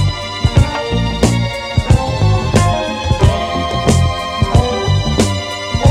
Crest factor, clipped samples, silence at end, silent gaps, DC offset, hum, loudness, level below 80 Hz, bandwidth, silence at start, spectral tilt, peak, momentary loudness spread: 14 dB; under 0.1%; 0 s; none; under 0.1%; none; -15 LUFS; -22 dBFS; 13 kHz; 0 s; -5.5 dB/octave; 0 dBFS; 5 LU